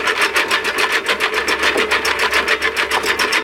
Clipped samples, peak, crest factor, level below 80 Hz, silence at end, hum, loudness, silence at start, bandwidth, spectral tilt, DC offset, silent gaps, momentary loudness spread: under 0.1%; -2 dBFS; 16 dB; -46 dBFS; 0 s; none; -15 LUFS; 0 s; 17 kHz; -1 dB/octave; under 0.1%; none; 2 LU